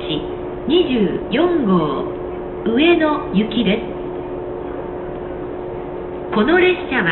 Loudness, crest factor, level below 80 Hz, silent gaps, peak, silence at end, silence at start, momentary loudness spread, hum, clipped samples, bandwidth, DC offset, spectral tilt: -19 LUFS; 14 dB; -40 dBFS; none; -4 dBFS; 0 s; 0 s; 13 LU; none; under 0.1%; 4.3 kHz; under 0.1%; -11 dB/octave